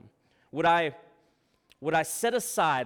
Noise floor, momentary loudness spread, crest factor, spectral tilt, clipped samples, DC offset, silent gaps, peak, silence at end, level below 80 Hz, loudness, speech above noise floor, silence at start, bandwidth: -69 dBFS; 10 LU; 16 dB; -3.5 dB/octave; under 0.1%; under 0.1%; none; -12 dBFS; 0 s; -66 dBFS; -27 LUFS; 42 dB; 0.55 s; 19 kHz